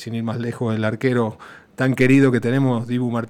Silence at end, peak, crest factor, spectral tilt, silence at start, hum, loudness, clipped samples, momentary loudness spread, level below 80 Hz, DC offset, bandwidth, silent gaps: 0 s; -4 dBFS; 14 dB; -7.5 dB/octave; 0 s; none; -20 LUFS; under 0.1%; 11 LU; -58 dBFS; under 0.1%; 13.5 kHz; none